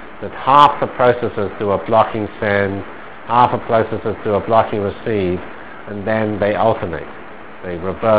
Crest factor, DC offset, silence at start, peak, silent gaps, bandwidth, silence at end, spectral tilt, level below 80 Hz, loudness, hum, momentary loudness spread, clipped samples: 18 dB; 2%; 0 s; 0 dBFS; none; 4 kHz; 0 s; -10 dB/octave; -42 dBFS; -17 LUFS; none; 17 LU; 0.2%